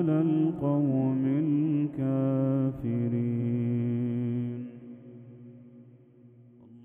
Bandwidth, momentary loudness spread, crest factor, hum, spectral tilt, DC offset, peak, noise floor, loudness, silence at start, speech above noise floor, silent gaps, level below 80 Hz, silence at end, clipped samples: 3.5 kHz; 20 LU; 14 dB; none; -12 dB/octave; under 0.1%; -14 dBFS; -55 dBFS; -28 LUFS; 0 s; 28 dB; none; -64 dBFS; 0 s; under 0.1%